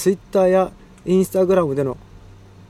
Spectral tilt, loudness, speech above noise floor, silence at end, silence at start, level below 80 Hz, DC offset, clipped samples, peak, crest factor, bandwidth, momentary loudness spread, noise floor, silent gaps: -7 dB/octave; -19 LUFS; 26 dB; 0.5 s; 0 s; -48 dBFS; under 0.1%; under 0.1%; -4 dBFS; 16 dB; 15 kHz; 10 LU; -43 dBFS; none